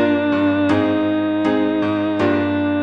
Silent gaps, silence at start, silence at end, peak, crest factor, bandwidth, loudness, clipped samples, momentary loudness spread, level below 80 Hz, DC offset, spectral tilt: none; 0 s; 0 s; -4 dBFS; 14 dB; 6.2 kHz; -18 LUFS; under 0.1%; 2 LU; -58 dBFS; 0.2%; -7.5 dB/octave